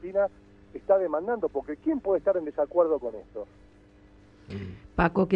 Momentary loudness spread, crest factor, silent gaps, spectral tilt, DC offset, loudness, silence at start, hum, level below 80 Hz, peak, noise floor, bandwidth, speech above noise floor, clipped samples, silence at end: 17 LU; 20 dB; none; -9.5 dB/octave; under 0.1%; -27 LUFS; 0 s; 50 Hz at -60 dBFS; -50 dBFS; -8 dBFS; -55 dBFS; 5.6 kHz; 28 dB; under 0.1%; 0 s